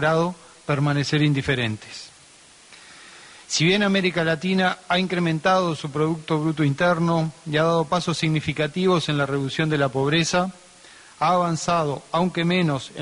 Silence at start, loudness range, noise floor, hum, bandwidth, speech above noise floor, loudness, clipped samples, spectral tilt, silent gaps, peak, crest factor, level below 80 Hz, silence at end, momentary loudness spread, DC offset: 0 s; 3 LU; -50 dBFS; none; 11 kHz; 28 dB; -22 LUFS; under 0.1%; -5.5 dB/octave; none; -8 dBFS; 14 dB; -56 dBFS; 0 s; 7 LU; under 0.1%